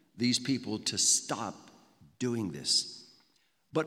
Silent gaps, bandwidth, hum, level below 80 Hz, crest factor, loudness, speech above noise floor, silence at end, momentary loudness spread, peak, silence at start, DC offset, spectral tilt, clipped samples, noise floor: none; 16.5 kHz; none; -76 dBFS; 20 dB; -30 LUFS; 40 dB; 0 s; 13 LU; -14 dBFS; 0.15 s; under 0.1%; -2.5 dB/octave; under 0.1%; -72 dBFS